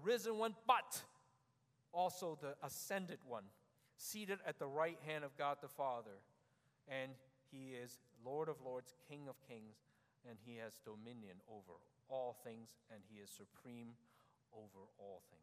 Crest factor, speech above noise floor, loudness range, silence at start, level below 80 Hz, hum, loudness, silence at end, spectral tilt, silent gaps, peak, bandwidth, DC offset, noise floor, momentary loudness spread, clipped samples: 28 dB; 33 dB; 11 LU; 0 s; under -90 dBFS; none; -46 LUFS; 0.05 s; -3.5 dB/octave; none; -22 dBFS; 15.5 kHz; under 0.1%; -80 dBFS; 20 LU; under 0.1%